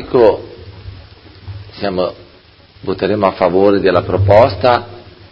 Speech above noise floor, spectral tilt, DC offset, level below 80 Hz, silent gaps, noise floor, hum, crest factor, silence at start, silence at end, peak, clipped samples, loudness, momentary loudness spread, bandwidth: 32 dB; -9 dB/octave; under 0.1%; -36 dBFS; none; -44 dBFS; none; 14 dB; 0 s; 0.3 s; 0 dBFS; 0.2%; -13 LUFS; 24 LU; 6.4 kHz